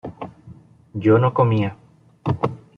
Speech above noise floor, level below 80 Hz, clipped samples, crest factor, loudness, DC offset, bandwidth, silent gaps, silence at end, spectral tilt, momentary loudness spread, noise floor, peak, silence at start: 27 dB; -54 dBFS; under 0.1%; 18 dB; -20 LUFS; under 0.1%; 5.2 kHz; none; 0.2 s; -10 dB/octave; 19 LU; -45 dBFS; -4 dBFS; 0.05 s